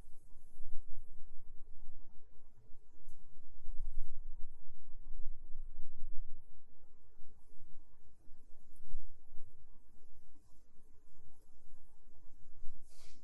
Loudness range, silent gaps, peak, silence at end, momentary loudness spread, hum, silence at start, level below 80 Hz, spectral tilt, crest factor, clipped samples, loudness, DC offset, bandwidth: 12 LU; none; -18 dBFS; 0 s; 16 LU; none; 0.05 s; -50 dBFS; -7 dB/octave; 12 dB; under 0.1%; -58 LUFS; under 0.1%; 1 kHz